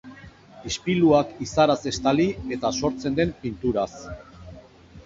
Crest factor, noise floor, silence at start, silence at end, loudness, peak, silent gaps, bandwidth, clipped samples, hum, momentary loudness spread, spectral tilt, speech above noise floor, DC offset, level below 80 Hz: 20 dB; -47 dBFS; 0.05 s; 0.05 s; -23 LUFS; -4 dBFS; none; 7.8 kHz; under 0.1%; none; 21 LU; -5.5 dB/octave; 24 dB; under 0.1%; -48 dBFS